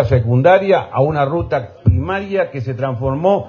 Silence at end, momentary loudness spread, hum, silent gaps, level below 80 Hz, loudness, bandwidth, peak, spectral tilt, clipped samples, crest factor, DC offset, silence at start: 0 s; 10 LU; none; none; -30 dBFS; -16 LUFS; 6.8 kHz; 0 dBFS; -9 dB/octave; under 0.1%; 14 dB; under 0.1%; 0 s